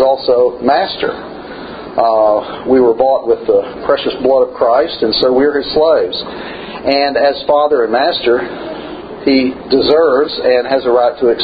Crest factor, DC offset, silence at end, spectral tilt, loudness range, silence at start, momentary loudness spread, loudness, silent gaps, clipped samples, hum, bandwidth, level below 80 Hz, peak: 12 dB; under 0.1%; 0 s; -8 dB/octave; 1 LU; 0 s; 14 LU; -13 LUFS; none; under 0.1%; none; 5 kHz; -46 dBFS; 0 dBFS